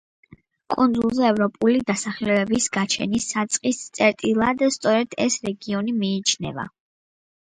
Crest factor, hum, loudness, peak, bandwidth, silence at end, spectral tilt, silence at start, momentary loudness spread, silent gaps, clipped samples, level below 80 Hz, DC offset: 18 dB; none; -22 LUFS; -4 dBFS; 9.6 kHz; 0.85 s; -3.5 dB/octave; 0.7 s; 7 LU; none; under 0.1%; -56 dBFS; under 0.1%